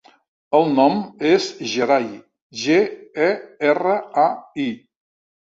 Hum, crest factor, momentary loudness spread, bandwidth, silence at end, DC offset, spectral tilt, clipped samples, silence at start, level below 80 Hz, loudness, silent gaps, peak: none; 18 dB; 9 LU; 7.8 kHz; 0.8 s; under 0.1%; -5 dB/octave; under 0.1%; 0.5 s; -66 dBFS; -19 LUFS; 2.42-2.50 s; -2 dBFS